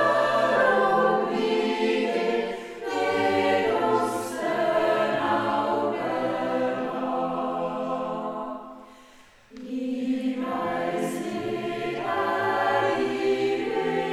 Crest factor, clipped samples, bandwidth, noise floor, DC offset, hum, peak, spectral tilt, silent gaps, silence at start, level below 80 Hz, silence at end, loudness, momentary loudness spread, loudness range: 16 dB; under 0.1%; 15 kHz; -52 dBFS; under 0.1%; none; -10 dBFS; -5 dB/octave; none; 0 s; -64 dBFS; 0 s; -25 LUFS; 9 LU; 7 LU